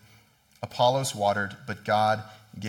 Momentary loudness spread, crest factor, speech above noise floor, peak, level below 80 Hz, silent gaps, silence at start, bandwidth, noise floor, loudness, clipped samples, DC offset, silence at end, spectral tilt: 15 LU; 20 dB; 33 dB; -8 dBFS; -68 dBFS; none; 0.6 s; 17.5 kHz; -59 dBFS; -26 LUFS; under 0.1%; under 0.1%; 0 s; -4 dB/octave